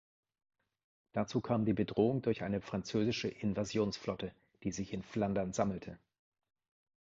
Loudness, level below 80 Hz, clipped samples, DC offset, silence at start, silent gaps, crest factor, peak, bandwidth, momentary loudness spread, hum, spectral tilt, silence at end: -36 LUFS; -62 dBFS; under 0.1%; under 0.1%; 1.15 s; none; 20 dB; -18 dBFS; 7.6 kHz; 10 LU; none; -6 dB/octave; 1.05 s